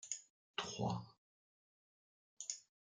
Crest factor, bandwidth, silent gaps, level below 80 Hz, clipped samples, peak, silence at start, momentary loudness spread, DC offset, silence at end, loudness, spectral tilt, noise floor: 24 dB; 10 kHz; 0.30-0.54 s, 1.18-2.37 s; -80 dBFS; under 0.1%; -24 dBFS; 0 s; 8 LU; under 0.1%; 0.3 s; -46 LUFS; -3.5 dB/octave; under -90 dBFS